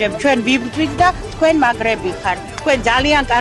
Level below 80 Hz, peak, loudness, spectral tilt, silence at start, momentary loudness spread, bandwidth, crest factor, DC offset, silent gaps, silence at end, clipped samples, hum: -34 dBFS; -4 dBFS; -16 LUFS; -4.5 dB/octave; 0 s; 7 LU; 11.5 kHz; 12 dB; under 0.1%; none; 0 s; under 0.1%; none